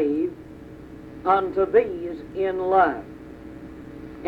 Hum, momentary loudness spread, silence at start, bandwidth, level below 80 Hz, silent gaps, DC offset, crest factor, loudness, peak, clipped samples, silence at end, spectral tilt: none; 21 LU; 0 s; 5.4 kHz; -52 dBFS; none; under 0.1%; 18 dB; -23 LUFS; -6 dBFS; under 0.1%; 0 s; -8 dB/octave